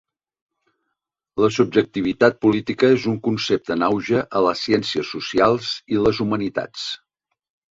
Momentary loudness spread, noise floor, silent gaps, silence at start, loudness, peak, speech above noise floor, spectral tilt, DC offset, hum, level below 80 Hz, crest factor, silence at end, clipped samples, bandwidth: 9 LU; -79 dBFS; none; 1.35 s; -20 LUFS; -2 dBFS; 60 dB; -5.5 dB/octave; under 0.1%; none; -54 dBFS; 18 dB; 0.75 s; under 0.1%; 7.8 kHz